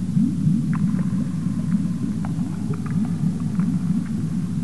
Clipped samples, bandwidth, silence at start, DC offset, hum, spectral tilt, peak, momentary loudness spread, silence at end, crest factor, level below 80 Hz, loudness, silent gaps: under 0.1%; 11.5 kHz; 0 s; 2%; none; -8.5 dB/octave; -8 dBFS; 4 LU; 0 s; 14 dB; -48 dBFS; -23 LUFS; none